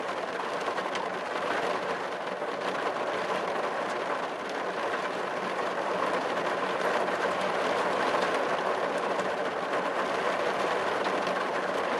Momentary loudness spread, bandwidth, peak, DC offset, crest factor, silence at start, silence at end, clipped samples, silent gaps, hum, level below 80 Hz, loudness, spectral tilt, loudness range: 4 LU; 12.5 kHz; -14 dBFS; under 0.1%; 16 dB; 0 s; 0 s; under 0.1%; none; none; -76 dBFS; -30 LUFS; -3.5 dB/octave; 3 LU